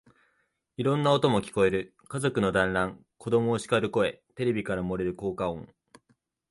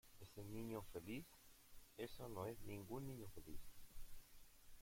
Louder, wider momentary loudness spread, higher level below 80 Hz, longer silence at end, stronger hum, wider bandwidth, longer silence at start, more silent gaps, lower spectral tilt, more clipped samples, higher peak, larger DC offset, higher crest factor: first, -27 LUFS vs -55 LUFS; second, 9 LU vs 16 LU; first, -54 dBFS vs -64 dBFS; first, 0.85 s vs 0 s; neither; second, 11.5 kHz vs 16.5 kHz; first, 0.8 s vs 0.05 s; neither; about the same, -6 dB/octave vs -5.5 dB/octave; neither; first, -10 dBFS vs -36 dBFS; neither; about the same, 18 dB vs 16 dB